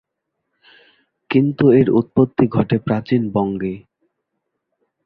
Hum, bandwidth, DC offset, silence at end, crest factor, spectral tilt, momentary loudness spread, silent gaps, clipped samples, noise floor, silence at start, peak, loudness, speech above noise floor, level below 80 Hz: none; 5.2 kHz; under 0.1%; 1.25 s; 18 dB; -11 dB/octave; 10 LU; none; under 0.1%; -76 dBFS; 1.3 s; -2 dBFS; -17 LUFS; 60 dB; -52 dBFS